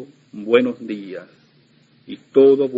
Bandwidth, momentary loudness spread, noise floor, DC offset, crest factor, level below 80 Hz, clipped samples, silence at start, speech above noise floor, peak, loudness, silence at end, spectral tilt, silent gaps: 5 kHz; 24 LU; -55 dBFS; under 0.1%; 18 dB; -70 dBFS; under 0.1%; 0 s; 38 dB; 0 dBFS; -18 LUFS; 0 s; -7.5 dB/octave; none